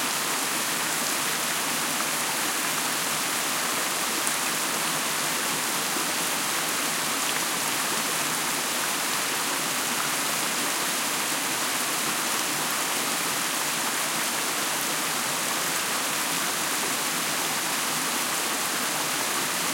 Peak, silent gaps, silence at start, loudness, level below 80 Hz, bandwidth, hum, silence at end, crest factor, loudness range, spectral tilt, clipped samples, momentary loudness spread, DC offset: -4 dBFS; none; 0 s; -24 LUFS; -72 dBFS; 16.5 kHz; none; 0 s; 22 dB; 0 LU; -0.5 dB/octave; under 0.1%; 0 LU; under 0.1%